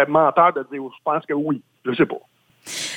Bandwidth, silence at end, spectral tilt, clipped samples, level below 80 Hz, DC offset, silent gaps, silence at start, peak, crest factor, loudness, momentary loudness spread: 17 kHz; 0 s; -4.5 dB/octave; under 0.1%; -68 dBFS; under 0.1%; none; 0 s; -4 dBFS; 18 dB; -21 LUFS; 15 LU